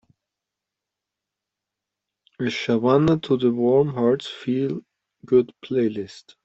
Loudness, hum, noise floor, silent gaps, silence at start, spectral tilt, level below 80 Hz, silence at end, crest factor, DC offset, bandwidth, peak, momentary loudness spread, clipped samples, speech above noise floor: -22 LUFS; none; -86 dBFS; none; 2.4 s; -7.5 dB/octave; -58 dBFS; 0.25 s; 20 dB; under 0.1%; 8 kHz; -4 dBFS; 10 LU; under 0.1%; 65 dB